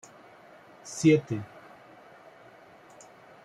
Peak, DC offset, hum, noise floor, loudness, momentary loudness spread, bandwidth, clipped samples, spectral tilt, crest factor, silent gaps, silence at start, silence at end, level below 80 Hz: -10 dBFS; under 0.1%; none; -53 dBFS; -26 LUFS; 28 LU; 12 kHz; under 0.1%; -6 dB/octave; 22 dB; none; 0.85 s; 2 s; -70 dBFS